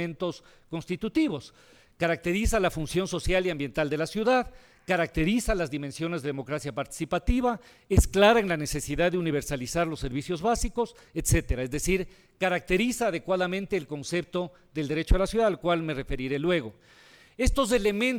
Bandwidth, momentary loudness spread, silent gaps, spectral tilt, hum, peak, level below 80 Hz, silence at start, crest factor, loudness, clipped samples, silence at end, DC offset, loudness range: 18.5 kHz; 9 LU; none; -5 dB/octave; none; -6 dBFS; -36 dBFS; 0 s; 20 dB; -28 LUFS; under 0.1%; 0 s; under 0.1%; 3 LU